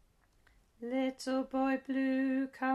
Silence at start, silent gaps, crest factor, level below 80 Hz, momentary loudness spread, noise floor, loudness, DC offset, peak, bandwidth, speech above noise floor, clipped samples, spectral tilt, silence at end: 0.8 s; none; 16 dB; -70 dBFS; 5 LU; -68 dBFS; -34 LUFS; under 0.1%; -20 dBFS; 11.5 kHz; 35 dB; under 0.1%; -4 dB/octave; 0 s